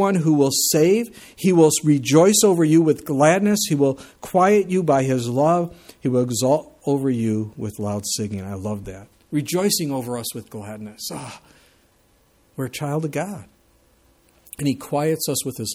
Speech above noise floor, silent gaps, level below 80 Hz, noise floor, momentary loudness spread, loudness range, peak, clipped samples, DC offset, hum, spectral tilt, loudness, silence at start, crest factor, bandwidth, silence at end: 39 dB; none; -58 dBFS; -59 dBFS; 16 LU; 14 LU; -4 dBFS; under 0.1%; under 0.1%; none; -5 dB/octave; -20 LUFS; 0 s; 18 dB; 17 kHz; 0 s